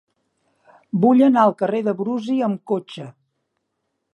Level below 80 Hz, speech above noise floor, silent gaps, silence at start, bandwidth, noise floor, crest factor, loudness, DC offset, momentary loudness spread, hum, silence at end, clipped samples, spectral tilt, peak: -76 dBFS; 57 dB; none; 0.95 s; 8.4 kHz; -75 dBFS; 18 dB; -19 LUFS; under 0.1%; 19 LU; none; 1.05 s; under 0.1%; -8 dB/octave; -2 dBFS